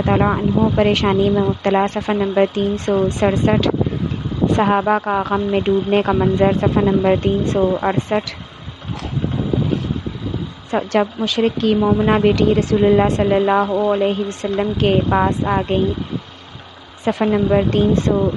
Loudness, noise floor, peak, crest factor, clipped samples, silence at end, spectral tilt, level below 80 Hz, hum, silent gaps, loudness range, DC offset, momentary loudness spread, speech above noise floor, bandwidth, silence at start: -17 LUFS; -38 dBFS; -2 dBFS; 16 dB; under 0.1%; 0 s; -7 dB/octave; -36 dBFS; none; none; 4 LU; under 0.1%; 9 LU; 22 dB; 9.6 kHz; 0 s